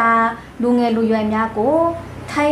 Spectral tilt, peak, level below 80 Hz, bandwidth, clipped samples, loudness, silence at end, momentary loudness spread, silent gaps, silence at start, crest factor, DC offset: -6.5 dB/octave; -4 dBFS; -46 dBFS; 12 kHz; under 0.1%; -18 LUFS; 0 s; 6 LU; none; 0 s; 14 dB; under 0.1%